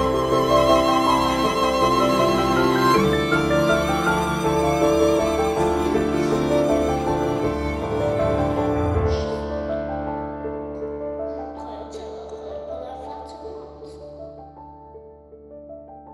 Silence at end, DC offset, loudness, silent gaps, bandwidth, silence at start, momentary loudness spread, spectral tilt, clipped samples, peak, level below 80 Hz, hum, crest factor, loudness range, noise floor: 0 s; under 0.1%; -21 LUFS; none; 16 kHz; 0 s; 19 LU; -5.5 dB/octave; under 0.1%; -4 dBFS; -38 dBFS; none; 16 dB; 17 LU; -44 dBFS